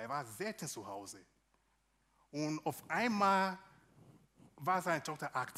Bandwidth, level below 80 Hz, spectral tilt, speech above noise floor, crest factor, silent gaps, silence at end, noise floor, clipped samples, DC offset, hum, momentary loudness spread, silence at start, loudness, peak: 16 kHz; -80 dBFS; -4.5 dB/octave; 39 dB; 22 dB; none; 0 s; -77 dBFS; under 0.1%; under 0.1%; none; 17 LU; 0 s; -37 LUFS; -18 dBFS